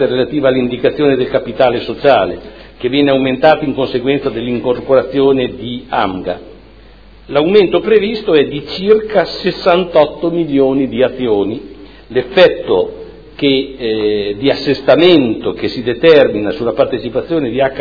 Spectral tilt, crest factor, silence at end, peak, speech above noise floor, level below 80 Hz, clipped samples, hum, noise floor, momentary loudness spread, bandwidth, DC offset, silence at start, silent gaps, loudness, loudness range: -7.5 dB/octave; 12 dB; 0 s; 0 dBFS; 27 dB; -42 dBFS; 0.3%; none; -39 dBFS; 9 LU; 5.4 kHz; 0.3%; 0 s; none; -13 LUFS; 3 LU